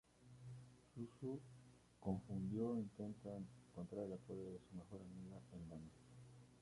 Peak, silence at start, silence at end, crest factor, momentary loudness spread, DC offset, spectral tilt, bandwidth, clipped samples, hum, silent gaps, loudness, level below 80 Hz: -30 dBFS; 0.1 s; 0 s; 22 dB; 18 LU; under 0.1%; -8.5 dB/octave; 11.5 kHz; under 0.1%; none; none; -51 LUFS; -72 dBFS